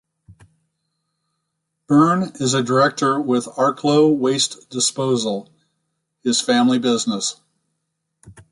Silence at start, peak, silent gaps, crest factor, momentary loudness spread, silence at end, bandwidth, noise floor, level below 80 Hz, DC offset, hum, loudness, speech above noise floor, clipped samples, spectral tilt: 0.3 s; -4 dBFS; none; 18 dB; 7 LU; 0.2 s; 11.5 kHz; -76 dBFS; -64 dBFS; under 0.1%; none; -18 LUFS; 58 dB; under 0.1%; -4 dB/octave